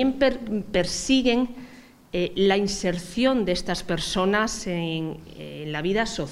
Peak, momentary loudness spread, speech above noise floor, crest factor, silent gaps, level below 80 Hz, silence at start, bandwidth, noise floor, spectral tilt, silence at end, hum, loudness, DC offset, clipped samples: -8 dBFS; 11 LU; 24 dB; 18 dB; none; -44 dBFS; 0 s; 14.5 kHz; -48 dBFS; -4.5 dB/octave; 0 s; none; -24 LUFS; under 0.1%; under 0.1%